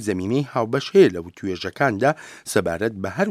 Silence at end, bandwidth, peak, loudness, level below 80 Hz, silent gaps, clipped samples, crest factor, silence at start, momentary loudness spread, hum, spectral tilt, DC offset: 0 s; 15 kHz; -2 dBFS; -21 LUFS; -56 dBFS; none; under 0.1%; 18 dB; 0 s; 12 LU; none; -5.5 dB/octave; under 0.1%